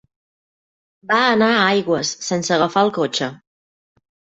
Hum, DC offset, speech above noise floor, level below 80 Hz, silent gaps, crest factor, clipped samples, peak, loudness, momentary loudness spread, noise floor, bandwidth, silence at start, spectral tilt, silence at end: none; under 0.1%; over 72 dB; -62 dBFS; none; 18 dB; under 0.1%; -2 dBFS; -18 LUFS; 8 LU; under -90 dBFS; 8.2 kHz; 1.1 s; -3.5 dB/octave; 1 s